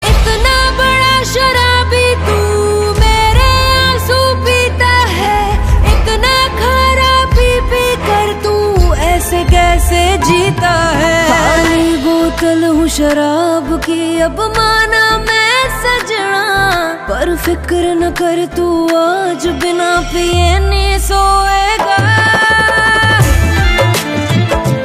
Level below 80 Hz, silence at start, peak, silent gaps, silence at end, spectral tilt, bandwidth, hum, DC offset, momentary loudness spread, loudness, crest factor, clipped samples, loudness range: -18 dBFS; 0 s; 0 dBFS; none; 0 s; -4.5 dB/octave; 15.5 kHz; none; under 0.1%; 5 LU; -11 LUFS; 10 dB; under 0.1%; 3 LU